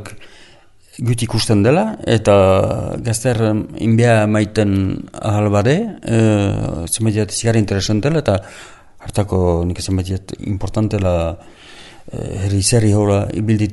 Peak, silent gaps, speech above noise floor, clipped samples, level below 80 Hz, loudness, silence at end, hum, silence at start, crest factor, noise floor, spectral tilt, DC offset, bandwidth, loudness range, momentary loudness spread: 0 dBFS; none; 30 dB; under 0.1%; -38 dBFS; -16 LUFS; 0 s; none; 0 s; 16 dB; -45 dBFS; -6 dB/octave; under 0.1%; 12 kHz; 5 LU; 11 LU